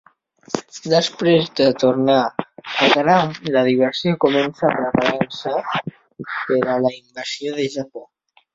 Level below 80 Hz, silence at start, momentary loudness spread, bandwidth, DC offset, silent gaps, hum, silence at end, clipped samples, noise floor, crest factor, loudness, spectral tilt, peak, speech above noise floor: -58 dBFS; 0.5 s; 13 LU; 7.8 kHz; under 0.1%; none; none; 0.5 s; under 0.1%; -57 dBFS; 18 dB; -19 LUFS; -5.5 dB/octave; -2 dBFS; 39 dB